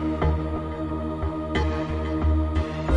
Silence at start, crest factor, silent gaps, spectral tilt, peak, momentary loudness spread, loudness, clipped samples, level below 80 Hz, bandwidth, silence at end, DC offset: 0 s; 16 dB; none; -8 dB/octave; -10 dBFS; 6 LU; -26 LUFS; under 0.1%; -30 dBFS; 7.6 kHz; 0 s; 0.3%